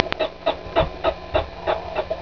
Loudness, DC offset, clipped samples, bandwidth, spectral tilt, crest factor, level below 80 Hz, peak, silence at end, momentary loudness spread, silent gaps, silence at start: -24 LUFS; 0.5%; under 0.1%; 5.4 kHz; -6.5 dB/octave; 24 dB; -38 dBFS; 0 dBFS; 0 s; 3 LU; none; 0 s